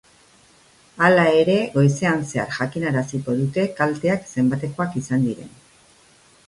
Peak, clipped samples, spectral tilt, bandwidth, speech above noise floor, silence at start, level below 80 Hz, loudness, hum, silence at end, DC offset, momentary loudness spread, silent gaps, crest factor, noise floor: -2 dBFS; under 0.1%; -6.5 dB/octave; 11.5 kHz; 34 dB; 0.95 s; -58 dBFS; -20 LUFS; none; 1 s; under 0.1%; 9 LU; none; 20 dB; -54 dBFS